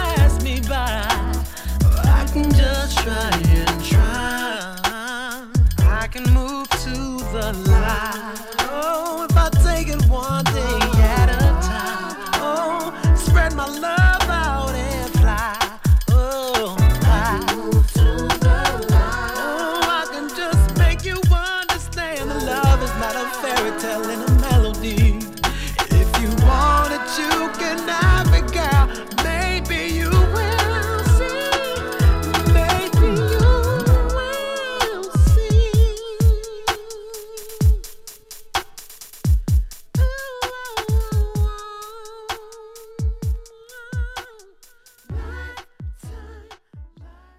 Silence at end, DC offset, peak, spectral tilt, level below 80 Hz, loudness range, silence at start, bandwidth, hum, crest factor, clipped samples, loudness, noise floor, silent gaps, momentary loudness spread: 0.3 s; under 0.1%; -2 dBFS; -5 dB/octave; -20 dBFS; 7 LU; 0 s; 16 kHz; none; 16 dB; under 0.1%; -19 LUFS; -50 dBFS; none; 12 LU